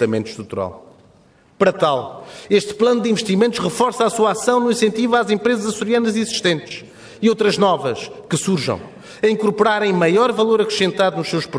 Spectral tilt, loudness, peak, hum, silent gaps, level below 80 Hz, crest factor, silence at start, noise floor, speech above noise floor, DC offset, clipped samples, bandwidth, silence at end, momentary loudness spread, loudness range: -4.5 dB/octave; -18 LUFS; -2 dBFS; none; none; -60 dBFS; 16 dB; 0 s; -52 dBFS; 34 dB; under 0.1%; under 0.1%; 11 kHz; 0 s; 11 LU; 2 LU